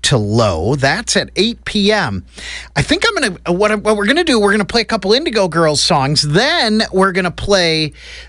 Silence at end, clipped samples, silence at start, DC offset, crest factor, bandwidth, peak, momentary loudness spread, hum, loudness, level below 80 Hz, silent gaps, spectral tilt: 0 s; under 0.1%; 0.05 s; under 0.1%; 12 dB; 14 kHz; -2 dBFS; 6 LU; none; -14 LUFS; -36 dBFS; none; -4 dB/octave